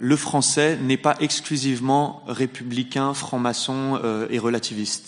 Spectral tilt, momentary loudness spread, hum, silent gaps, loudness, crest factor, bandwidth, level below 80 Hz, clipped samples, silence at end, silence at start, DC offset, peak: -4 dB/octave; 7 LU; none; none; -22 LUFS; 18 dB; 11 kHz; -68 dBFS; under 0.1%; 0 s; 0 s; under 0.1%; -4 dBFS